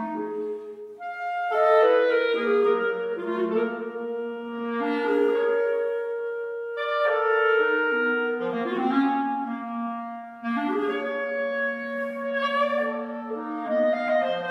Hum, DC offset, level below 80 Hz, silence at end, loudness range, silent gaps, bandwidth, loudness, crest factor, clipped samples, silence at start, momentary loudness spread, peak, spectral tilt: none; under 0.1%; -78 dBFS; 0 s; 4 LU; none; 6 kHz; -25 LUFS; 16 dB; under 0.1%; 0 s; 11 LU; -8 dBFS; -6 dB/octave